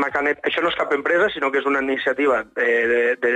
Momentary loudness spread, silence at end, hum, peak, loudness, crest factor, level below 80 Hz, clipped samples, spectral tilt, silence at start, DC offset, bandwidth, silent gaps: 3 LU; 0 s; none; -8 dBFS; -20 LUFS; 12 dB; -58 dBFS; under 0.1%; -4.5 dB/octave; 0 s; under 0.1%; 9 kHz; none